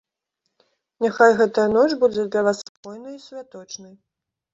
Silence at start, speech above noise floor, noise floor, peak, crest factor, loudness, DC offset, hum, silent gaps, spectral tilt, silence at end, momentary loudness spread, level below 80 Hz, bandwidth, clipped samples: 1 s; 58 dB; -78 dBFS; -2 dBFS; 20 dB; -19 LUFS; under 0.1%; none; 2.69-2.83 s; -4.5 dB/octave; 0.7 s; 22 LU; -62 dBFS; 7.8 kHz; under 0.1%